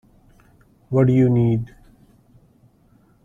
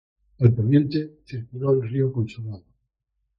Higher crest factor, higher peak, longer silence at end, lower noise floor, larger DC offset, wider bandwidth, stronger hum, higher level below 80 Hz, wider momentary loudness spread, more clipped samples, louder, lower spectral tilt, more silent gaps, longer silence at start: about the same, 18 dB vs 20 dB; about the same, -4 dBFS vs -2 dBFS; first, 1.6 s vs 0.8 s; second, -56 dBFS vs -77 dBFS; neither; second, 3.5 kHz vs 5.6 kHz; neither; first, -50 dBFS vs -56 dBFS; second, 10 LU vs 16 LU; neither; first, -18 LUFS vs -22 LUFS; about the same, -10.5 dB/octave vs -10.5 dB/octave; neither; first, 0.9 s vs 0.4 s